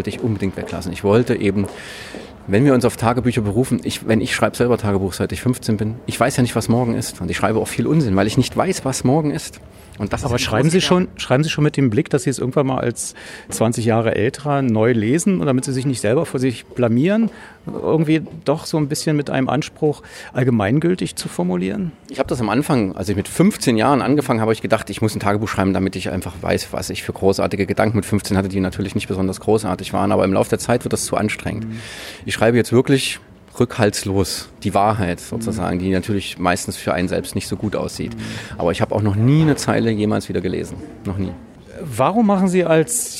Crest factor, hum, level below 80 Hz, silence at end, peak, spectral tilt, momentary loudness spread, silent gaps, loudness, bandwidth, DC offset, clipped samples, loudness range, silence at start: 18 dB; none; -46 dBFS; 0 s; -2 dBFS; -5.5 dB/octave; 10 LU; none; -19 LUFS; 16 kHz; under 0.1%; under 0.1%; 2 LU; 0 s